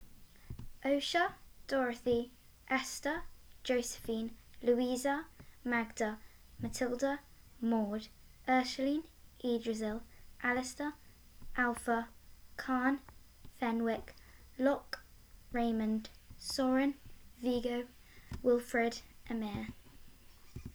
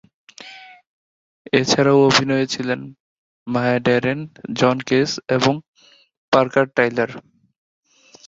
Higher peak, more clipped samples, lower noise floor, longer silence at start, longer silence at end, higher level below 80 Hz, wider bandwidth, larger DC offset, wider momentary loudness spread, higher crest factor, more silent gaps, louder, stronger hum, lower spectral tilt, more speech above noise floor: second, -16 dBFS vs -2 dBFS; neither; first, -57 dBFS vs -41 dBFS; second, 0 s vs 0.4 s; second, 0.05 s vs 1.1 s; about the same, -58 dBFS vs -58 dBFS; first, over 20 kHz vs 8 kHz; neither; second, 16 LU vs 23 LU; about the same, 20 dB vs 20 dB; second, none vs 0.87-1.45 s, 3.00-3.46 s, 5.68-5.74 s, 6.17-6.32 s; second, -36 LUFS vs -18 LUFS; neither; about the same, -4 dB/octave vs -5 dB/octave; about the same, 23 dB vs 23 dB